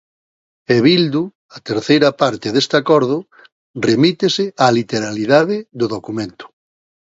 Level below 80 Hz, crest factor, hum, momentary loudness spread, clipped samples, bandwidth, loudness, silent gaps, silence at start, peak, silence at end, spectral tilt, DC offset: -58 dBFS; 16 dB; none; 12 LU; under 0.1%; 8 kHz; -16 LUFS; 1.35-1.49 s, 3.52-3.74 s; 0.7 s; 0 dBFS; 0.75 s; -5.5 dB/octave; under 0.1%